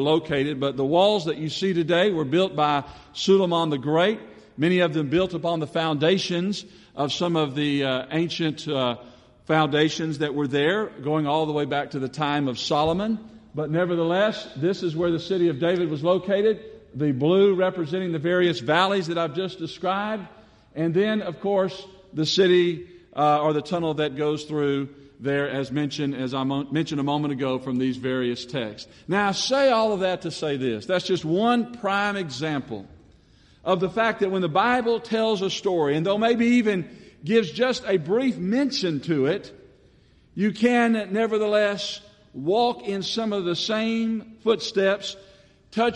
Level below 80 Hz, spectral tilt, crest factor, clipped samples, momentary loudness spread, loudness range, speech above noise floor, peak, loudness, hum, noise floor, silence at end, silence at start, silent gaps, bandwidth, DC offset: -60 dBFS; -5.5 dB/octave; 18 dB; under 0.1%; 9 LU; 3 LU; 33 dB; -6 dBFS; -24 LUFS; none; -56 dBFS; 0 s; 0 s; none; 10.5 kHz; under 0.1%